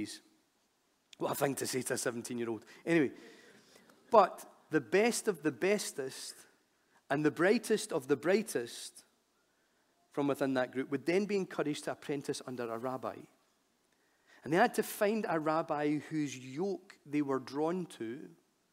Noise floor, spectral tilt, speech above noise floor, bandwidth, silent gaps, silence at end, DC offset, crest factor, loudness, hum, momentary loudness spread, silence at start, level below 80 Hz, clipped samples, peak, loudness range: -75 dBFS; -4.5 dB/octave; 42 dB; 16 kHz; none; 0.4 s; under 0.1%; 24 dB; -34 LUFS; none; 14 LU; 0 s; -84 dBFS; under 0.1%; -10 dBFS; 4 LU